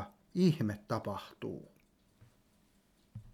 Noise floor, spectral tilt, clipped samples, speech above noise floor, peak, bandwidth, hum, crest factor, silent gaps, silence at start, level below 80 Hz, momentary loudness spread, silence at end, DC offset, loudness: -70 dBFS; -7.5 dB/octave; under 0.1%; 36 dB; -18 dBFS; 15 kHz; none; 20 dB; none; 0 s; -68 dBFS; 20 LU; 0.05 s; under 0.1%; -35 LUFS